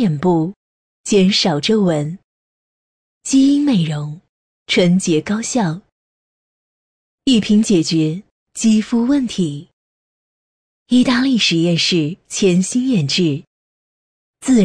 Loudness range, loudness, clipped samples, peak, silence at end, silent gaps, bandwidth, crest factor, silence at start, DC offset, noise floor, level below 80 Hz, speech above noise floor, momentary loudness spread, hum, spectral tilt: 3 LU; -16 LUFS; under 0.1%; -4 dBFS; 0 s; 0.56-1.04 s, 2.24-3.21 s, 4.29-4.66 s, 5.92-7.18 s, 8.31-8.47 s, 9.73-10.86 s, 13.47-14.34 s; 10.5 kHz; 14 dB; 0 s; under 0.1%; under -90 dBFS; -52 dBFS; over 75 dB; 13 LU; none; -5 dB/octave